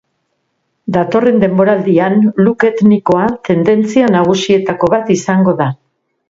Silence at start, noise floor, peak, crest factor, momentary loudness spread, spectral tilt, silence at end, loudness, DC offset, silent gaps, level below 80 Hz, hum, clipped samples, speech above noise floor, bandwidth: 0.85 s; -66 dBFS; 0 dBFS; 12 dB; 5 LU; -6.5 dB/octave; 0.55 s; -12 LUFS; under 0.1%; none; -50 dBFS; none; under 0.1%; 55 dB; 7.8 kHz